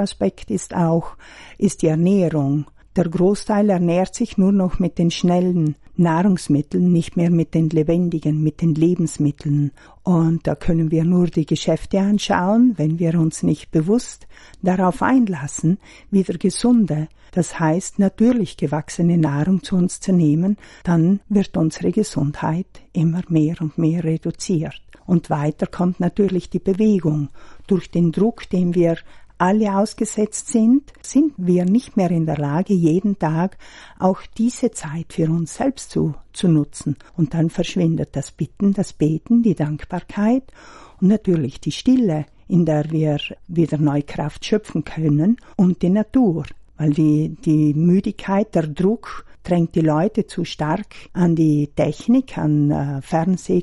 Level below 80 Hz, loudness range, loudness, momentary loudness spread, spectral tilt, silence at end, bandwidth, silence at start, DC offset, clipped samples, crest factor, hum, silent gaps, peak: -44 dBFS; 3 LU; -19 LUFS; 7 LU; -7 dB/octave; 0 s; 11.5 kHz; 0 s; under 0.1%; under 0.1%; 14 dB; none; none; -4 dBFS